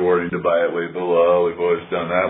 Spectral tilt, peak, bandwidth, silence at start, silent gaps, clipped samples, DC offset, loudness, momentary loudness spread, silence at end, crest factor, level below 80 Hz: -10.5 dB/octave; -4 dBFS; 4 kHz; 0 s; none; under 0.1%; under 0.1%; -19 LUFS; 6 LU; 0 s; 14 dB; -56 dBFS